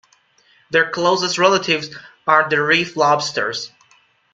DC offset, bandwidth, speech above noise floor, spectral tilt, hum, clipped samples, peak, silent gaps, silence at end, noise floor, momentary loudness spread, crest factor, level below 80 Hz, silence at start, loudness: under 0.1%; 9.4 kHz; 39 dB; -3 dB/octave; none; under 0.1%; 0 dBFS; none; 0.65 s; -56 dBFS; 11 LU; 18 dB; -64 dBFS; 0.7 s; -17 LUFS